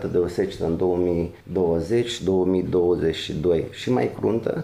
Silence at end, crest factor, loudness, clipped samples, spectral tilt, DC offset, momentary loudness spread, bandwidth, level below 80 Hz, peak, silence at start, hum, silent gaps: 0 s; 12 dB; -23 LUFS; under 0.1%; -7 dB/octave; under 0.1%; 4 LU; 12.5 kHz; -48 dBFS; -10 dBFS; 0 s; none; none